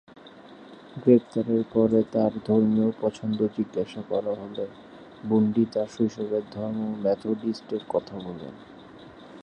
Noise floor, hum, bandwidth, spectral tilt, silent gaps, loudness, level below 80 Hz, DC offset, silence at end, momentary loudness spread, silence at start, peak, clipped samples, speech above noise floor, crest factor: -47 dBFS; none; 8.4 kHz; -8.5 dB/octave; none; -26 LUFS; -62 dBFS; under 0.1%; 0 s; 23 LU; 0.25 s; -6 dBFS; under 0.1%; 22 dB; 20 dB